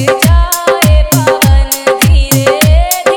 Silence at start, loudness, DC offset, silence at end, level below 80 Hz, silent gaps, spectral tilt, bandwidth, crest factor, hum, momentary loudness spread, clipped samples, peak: 0 s; -9 LUFS; under 0.1%; 0 s; -12 dBFS; none; -4.5 dB/octave; over 20 kHz; 8 dB; none; 2 LU; 0.7%; 0 dBFS